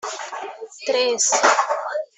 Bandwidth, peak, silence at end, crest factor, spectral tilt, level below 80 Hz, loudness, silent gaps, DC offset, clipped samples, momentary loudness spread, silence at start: 8.4 kHz; -2 dBFS; 0.1 s; 20 dB; 1 dB/octave; -74 dBFS; -19 LUFS; none; under 0.1%; under 0.1%; 16 LU; 0.05 s